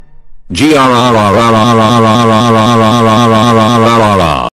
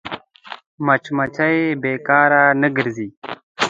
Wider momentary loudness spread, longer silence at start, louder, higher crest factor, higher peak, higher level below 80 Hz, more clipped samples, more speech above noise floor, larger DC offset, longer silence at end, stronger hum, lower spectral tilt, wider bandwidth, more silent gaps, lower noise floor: second, 2 LU vs 20 LU; about the same, 0 s vs 0.05 s; first, -7 LUFS vs -17 LUFS; second, 6 dB vs 18 dB; about the same, 0 dBFS vs 0 dBFS; first, -36 dBFS vs -62 dBFS; first, 0.3% vs under 0.1%; about the same, 22 dB vs 22 dB; neither; about the same, 0.05 s vs 0 s; neither; about the same, -5.5 dB/octave vs -5.5 dB/octave; first, 14.5 kHz vs 9.2 kHz; second, none vs 0.67-0.78 s, 3.17-3.22 s, 3.43-3.55 s; second, -28 dBFS vs -39 dBFS